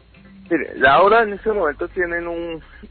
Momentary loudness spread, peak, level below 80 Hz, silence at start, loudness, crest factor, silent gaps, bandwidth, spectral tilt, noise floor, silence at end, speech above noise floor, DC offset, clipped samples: 15 LU; -4 dBFS; -44 dBFS; 0.5 s; -18 LUFS; 16 dB; none; 4.5 kHz; -10 dB/octave; -44 dBFS; 0.05 s; 26 dB; under 0.1%; under 0.1%